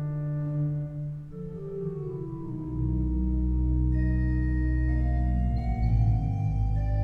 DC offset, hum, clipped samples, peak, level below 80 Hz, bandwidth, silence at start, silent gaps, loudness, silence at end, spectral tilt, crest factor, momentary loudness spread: under 0.1%; none; under 0.1%; -14 dBFS; -30 dBFS; 4.4 kHz; 0 s; none; -29 LUFS; 0 s; -11 dB/octave; 12 dB; 10 LU